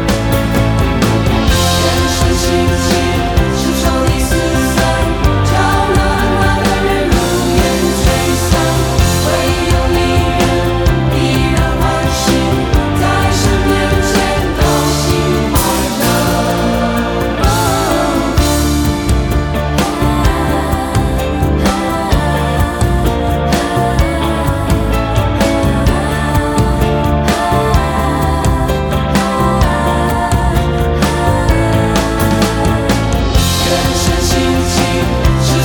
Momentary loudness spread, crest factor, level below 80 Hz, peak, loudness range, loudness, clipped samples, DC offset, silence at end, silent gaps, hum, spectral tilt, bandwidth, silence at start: 2 LU; 12 dB; -18 dBFS; 0 dBFS; 2 LU; -13 LUFS; under 0.1%; under 0.1%; 0 s; none; none; -5 dB/octave; 19.5 kHz; 0 s